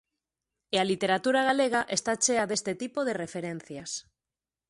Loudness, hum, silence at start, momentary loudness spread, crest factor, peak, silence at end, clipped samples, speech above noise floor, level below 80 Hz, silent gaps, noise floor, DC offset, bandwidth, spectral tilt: -28 LUFS; none; 0.7 s; 12 LU; 18 dB; -12 dBFS; 0.7 s; under 0.1%; over 62 dB; -70 dBFS; none; under -90 dBFS; under 0.1%; 11.5 kHz; -2.5 dB/octave